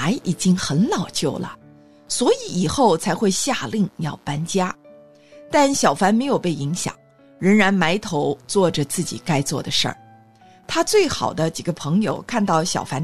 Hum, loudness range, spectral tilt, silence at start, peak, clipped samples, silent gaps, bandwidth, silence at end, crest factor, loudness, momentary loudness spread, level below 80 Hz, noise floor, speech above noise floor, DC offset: none; 2 LU; -4.5 dB/octave; 0 s; -4 dBFS; under 0.1%; none; 13.5 kHz; 0 s; 16 dB; -20 LUFS; 9 LU; -52 dBFS; -50 dBFS; 30 dB; 0.6%